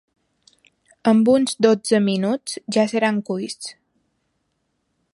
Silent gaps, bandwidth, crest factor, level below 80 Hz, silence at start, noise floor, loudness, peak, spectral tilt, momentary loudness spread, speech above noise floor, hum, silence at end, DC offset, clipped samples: none; 11.5 kHz; 18 dB; -68 dBFS; 1.05 s; -72 dBFS; -19 LUFS; -4 dBFS; -5 dB/octave; 12 LU; 53 dB; none; 1.4 s; under 0.1%; under 0.1%